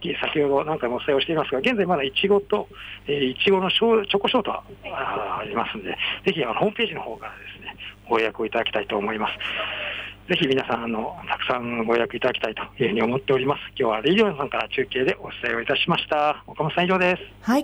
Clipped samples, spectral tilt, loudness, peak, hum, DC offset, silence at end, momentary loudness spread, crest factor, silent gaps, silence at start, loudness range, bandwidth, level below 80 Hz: under 0.1%; -6 dB/octave; -23 LUFS; -10 dBFS; none; under 0.1%; 0 s; 9 LU; 14 dB; none; 0 s; 4 LU; 13.5 kHz; -52 dBFS